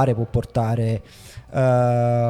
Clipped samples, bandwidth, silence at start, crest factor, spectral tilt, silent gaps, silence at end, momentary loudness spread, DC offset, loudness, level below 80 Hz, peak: under 0.1%; 11 kHz; 0 s; 14 dB; -8.5 dB/octave; none; 0 s; 14 LU; under 0.1%; -21 LUFS; -44 dBFS; -6 dBFS